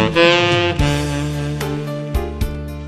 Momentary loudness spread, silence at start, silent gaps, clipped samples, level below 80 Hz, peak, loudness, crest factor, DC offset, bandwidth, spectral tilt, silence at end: 12 LU; 0 s; none; under 0.1%; -28 dBFS; 0 dBFS; -18 LUFS; 18 dB; under 0.1%; 14.5 kHz; -5.5 dB/octave; 0 s